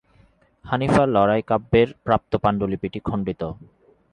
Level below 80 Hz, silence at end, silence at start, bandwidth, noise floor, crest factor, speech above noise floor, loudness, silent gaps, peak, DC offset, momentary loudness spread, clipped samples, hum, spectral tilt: -44 dBFS; 0.6 s; 0.65 s; 11 kHz; -57 dBFS; 18 dB; 36 dB; -21 LUFS; none; -4 dBFS; under 0.1%; 10 LU; under 0.1%; none; -7.5 dB/octave